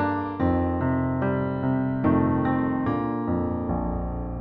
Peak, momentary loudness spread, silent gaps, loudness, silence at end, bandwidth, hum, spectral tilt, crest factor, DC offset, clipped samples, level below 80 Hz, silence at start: -8 dBFS; 5 LU; none; -25 LUFS; 0 s; 4.5 kHz; none; -11.5 dB/octave; 16 dB; under 0.1%; under 0.1%; -38 dBFS; 0 s